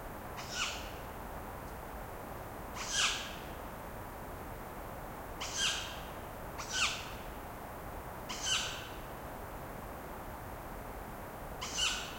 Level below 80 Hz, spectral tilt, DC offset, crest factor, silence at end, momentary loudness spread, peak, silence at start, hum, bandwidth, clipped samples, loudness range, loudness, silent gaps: -52 dBFS; -1.5 dB/octave; under 0.1%; 22 dB; 0 s; 13 LU; -18 dBFS; 0 s; none; 16.5 kHz; under 0.1%; 3 LU; -39 LUFS; none